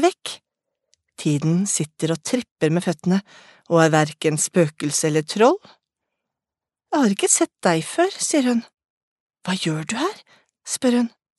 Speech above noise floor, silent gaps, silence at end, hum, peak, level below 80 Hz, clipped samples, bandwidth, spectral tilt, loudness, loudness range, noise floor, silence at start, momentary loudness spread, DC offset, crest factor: 68 dB; 2.51-2.56 s, 8.90-9.27 s; 0.3 s; none; 0 dBFS; -70 dBFS; under 0.1%; 12 kHz; -4.5 dB/octave; -21 LUFS; 3 LU; -89 dBFS; 0 s; 10 LU; under 0.1%; 20 dB